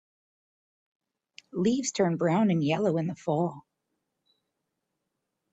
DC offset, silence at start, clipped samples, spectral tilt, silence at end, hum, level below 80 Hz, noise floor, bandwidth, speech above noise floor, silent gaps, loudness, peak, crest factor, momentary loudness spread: under 0.1%; 1.55 s; under 0.1%; -6 dB/octave; 1.9 s; none; -72 dBFS; -83 dBFS; 8.4 kHz; 56 dB; none; -27 LUFS; -12 dBFS; 18 dB; 6 LU